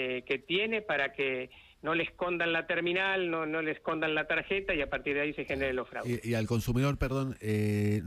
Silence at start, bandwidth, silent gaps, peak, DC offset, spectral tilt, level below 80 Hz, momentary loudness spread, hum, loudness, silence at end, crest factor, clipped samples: 0 s; 15.5 kHz; none; -16 dBFS; under 0.1%; -6 dB/octave; -50 dBFS; 4 LU; none; -31 LUFS; 0 s; 16 dB; under 0.1%